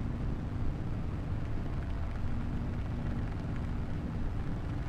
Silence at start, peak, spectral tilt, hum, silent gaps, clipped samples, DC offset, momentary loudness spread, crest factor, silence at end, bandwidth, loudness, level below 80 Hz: 0 s; -22 dBFS; -8.5 dB/octave; none; none; under 0.1%; under 0.1%; 1 LU; 12 dB; 0 s; 8 kHz; -37 LUFS; -38 dBFS